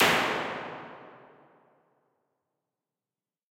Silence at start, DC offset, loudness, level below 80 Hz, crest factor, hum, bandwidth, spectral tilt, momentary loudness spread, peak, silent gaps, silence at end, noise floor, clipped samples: 0 s; under 0.1%; -29 LUFS; -68 dBFS; 28 dB; none; 16.5 kHz; -2.5 dB/octave; 25 LU; -6 dBFS; none; 2.35 s; under -90 dBFS; under 0.1%